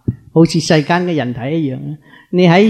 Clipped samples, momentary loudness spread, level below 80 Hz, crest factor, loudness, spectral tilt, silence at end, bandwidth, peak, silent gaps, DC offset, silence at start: under 0.1%; 14 LU; -46 dBFS; 14 dB; -14 LUFS; -6.5 dB/octave; 0 s; 9.6 kHz; 0 dBFS; none; under 0.1%; 0.1 s